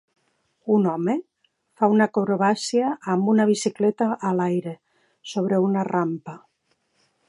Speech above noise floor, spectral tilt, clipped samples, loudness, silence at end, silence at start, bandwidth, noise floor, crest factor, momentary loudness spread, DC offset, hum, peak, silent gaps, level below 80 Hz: 49 dB; -6 dB/octave; under 0.1%; -22 LUFS; 0.9 s; 0.65 s; 11.5 kHz; -70 dBFS; 18 dB; 13 LU; under 0.1%; none; -4 dBFS; none; -74 dBFS